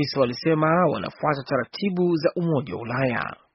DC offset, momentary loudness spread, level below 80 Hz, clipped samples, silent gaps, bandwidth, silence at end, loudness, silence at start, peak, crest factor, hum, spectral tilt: under 0.1%; 7 LU; -60 dBFS; under 0.1%; none; 6 kHz; 0.2 s; -24 LUFS; 0 s; -6 dBFS; 16 dB; none; -5.5 dB/octave